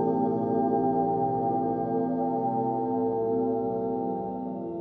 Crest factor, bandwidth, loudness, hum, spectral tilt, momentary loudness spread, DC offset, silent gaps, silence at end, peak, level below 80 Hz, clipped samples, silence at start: 14 dB; 3.4 kHz; -28 LUFS; none; -12.5 dB/octave; 6 LU; under 0.1%; none; 0 s; -14 dBFS; -60 dBFS; under 0.1%; 0 s